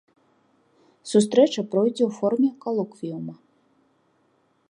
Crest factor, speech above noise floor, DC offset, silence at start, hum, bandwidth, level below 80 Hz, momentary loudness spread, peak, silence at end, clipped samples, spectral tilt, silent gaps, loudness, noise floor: 22 dB; 44 dB; under 0.1%; 1.05 s; none; 11 kHz; -78 dBFS; 15 LU; -4 dBFS; 1.35 s; under 0.1%; -6 dB/octave; none; -23 LUFS; -66 dBFS